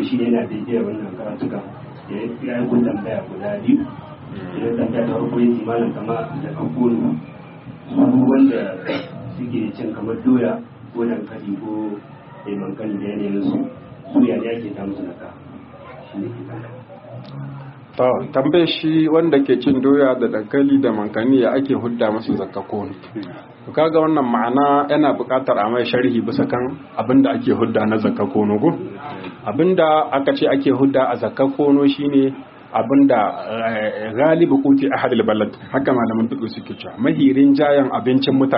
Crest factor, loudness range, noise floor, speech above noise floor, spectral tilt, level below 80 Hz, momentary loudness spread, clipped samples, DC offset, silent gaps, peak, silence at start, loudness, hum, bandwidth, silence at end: 18 dB; 7 LU; -38 dBFS; 20 dB; -5.5 dB/octave; -60 dBFS; 17 LU; under 0.1%; under 0.1%; none; 0 dBFS; 0 s; -18 LUFS; none; 5.4 kHz; 0 s